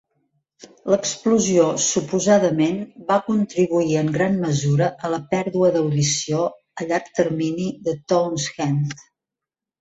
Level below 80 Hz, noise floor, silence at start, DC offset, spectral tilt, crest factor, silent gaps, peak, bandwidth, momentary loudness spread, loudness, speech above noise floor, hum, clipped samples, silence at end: -58 dBFS; -87 dBFS; 0.85 s; under 0.1%; -5 dB/octave; 18 dB; none; -4 dBFS; 8.2 kHz; 8 LU; -20 LUFS; 67 dB; none; under 0.1%; 0.85 s